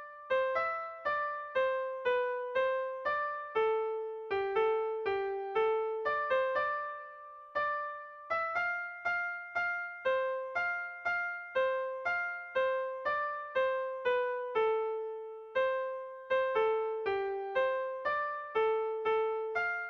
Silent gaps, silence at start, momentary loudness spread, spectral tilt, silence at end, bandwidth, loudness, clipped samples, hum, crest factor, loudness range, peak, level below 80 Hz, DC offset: none; 0 s; 5 LU; -4.5 dB/octave; 0 s; 6.4 kHz; -33 LUFS; under 0.1%; none; 14 dB; 2 LU; -20 dBFS; -72 dBFS; under 0.1%